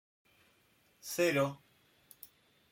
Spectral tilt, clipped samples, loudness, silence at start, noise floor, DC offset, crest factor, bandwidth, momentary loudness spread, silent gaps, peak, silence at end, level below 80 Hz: -4.5 dB/octave; under 0.1%; -33 LUFS; 1.05 s; -70 dBFS; under 0.1%; 20 dB; 16.5 kHz; 24 LU; none; -18 dBFS; 1.15 s; -78 dBFS